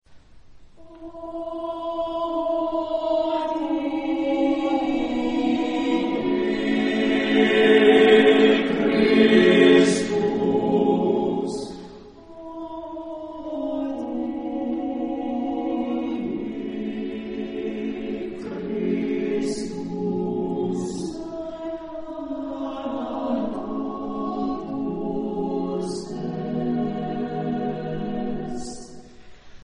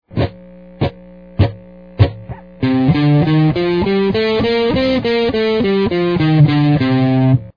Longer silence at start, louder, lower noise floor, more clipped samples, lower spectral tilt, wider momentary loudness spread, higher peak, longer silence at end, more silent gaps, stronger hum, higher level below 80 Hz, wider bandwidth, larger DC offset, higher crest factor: about the same, 0.1 s vs 0.1 s; second, -23 LUFS vs -15 LUFS; first, -46 dBFS vs -38 dBFS; neither; second, -5.5 dB/octave vs -9.5 dB/octave; first, 17 LU vs 10 LU; about the same, -2 dBFS vs 0 dBFS; about the same, 0 s vs 0.05 s; neither; neither; second, -52 dBFS vs -36 dBFS; first, 10.5 kHz vs 5.2 kHz; second, under 0.1% vs 0.3%; first, 20 dB vs 14 dB